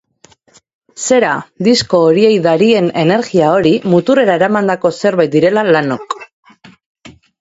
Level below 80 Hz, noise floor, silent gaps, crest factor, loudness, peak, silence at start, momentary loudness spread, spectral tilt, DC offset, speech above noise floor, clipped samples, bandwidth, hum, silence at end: -54 dBFS; -49 dBFS; 6.33-6.43 s, 6.86-6.95 s; 12 dB; -12 LUFS; 0 dBFS; 1 s; 6 LU; -5 dB/octave; under 0.1%; 38 dB; under 0.1%; 8 kHz; none; 0.3 s